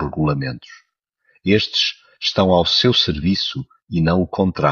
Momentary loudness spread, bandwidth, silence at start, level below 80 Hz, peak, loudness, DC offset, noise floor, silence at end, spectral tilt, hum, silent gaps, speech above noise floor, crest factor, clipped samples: 12 LU; 7.2 kHz; 0 s; -42 dBFS; -2 dBFS; -18 LUFS; under 0.1%; -65 dBFS; 0 s; -5.5 dB/octave; none; none; 47 dB; 18 dB; under 0.1%